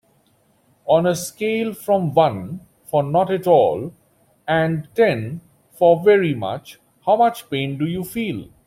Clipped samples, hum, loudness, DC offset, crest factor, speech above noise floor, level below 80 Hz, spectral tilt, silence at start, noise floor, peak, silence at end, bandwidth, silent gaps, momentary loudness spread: under 0.1%; none; -19 LUFS; under 0.1%; 18 dB; 42 dB; -58 dBFS; -6 dB/octave; 0.85 s; -60 dBFS; -2 dBFS; 0.2 s; 16.5 kHz; none; 16 LU